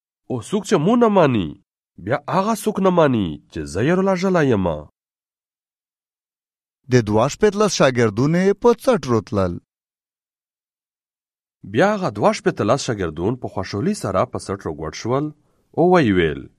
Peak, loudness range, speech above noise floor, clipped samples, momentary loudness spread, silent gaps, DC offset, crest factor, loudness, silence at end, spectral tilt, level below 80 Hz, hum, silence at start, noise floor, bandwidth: 0 dBFS; 5 LU; over 72 dB; under 0.1%; 12 LU; none; under 0.1%; 18 dB; -19 LUFS; 0.1 s; -6 dB/octave; -48 dBFS; none; 0.3 s; under -90 dBFS; 14 kHz